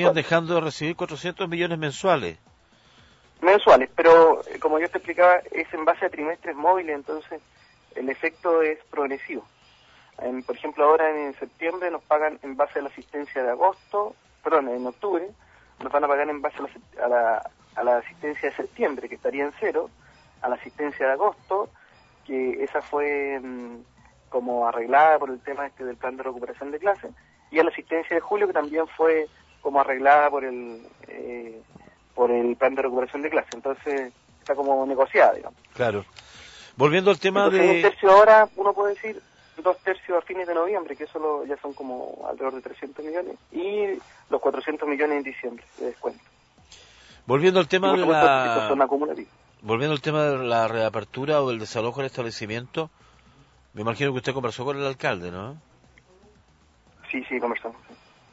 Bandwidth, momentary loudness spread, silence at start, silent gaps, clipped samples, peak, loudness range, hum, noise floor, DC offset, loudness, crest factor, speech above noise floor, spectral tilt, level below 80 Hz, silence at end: 8 kHz; 17 LU; 0 s; none; under 0.1%; -4 dBFS; 10 LU; none; -58 dBFS; under 0.1%; -23 LUFS; 20 dB; 35 dB; -5.5 dB/octave; -62 dBFS; 0.6 s